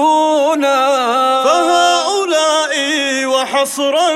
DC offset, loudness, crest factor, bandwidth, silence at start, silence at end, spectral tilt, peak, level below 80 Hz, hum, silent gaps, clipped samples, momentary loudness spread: under 0.1%; -13 LUFS; 12 dB; over 20 kHz; 0 s; 0 s; -0.5 dB/octave; -2 dBFS; -68 dBFS; none; none; under 0.1%; 3 LU